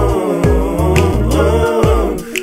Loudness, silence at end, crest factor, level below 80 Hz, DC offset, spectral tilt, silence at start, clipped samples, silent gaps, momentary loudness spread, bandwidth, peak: -14 LUFS; 0 s; 12 dB; -18 dBFS; under 0.1%; -6.5 dB/octave; 0 s; under 0.1%; none; 2 LU; 16 kHz; 0 dBFS